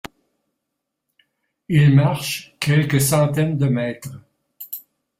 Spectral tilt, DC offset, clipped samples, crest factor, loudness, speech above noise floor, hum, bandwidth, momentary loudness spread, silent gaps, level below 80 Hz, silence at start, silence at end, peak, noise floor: -6 dB/octave; under 0.1%; under 0.1%; 16 dB; -18 LUFS; 62 dB; none; 16 kHz; 20 LU; none; -54 dBFS; 1.7 s; 0.4 s; -4 dBFS; -79 dBFS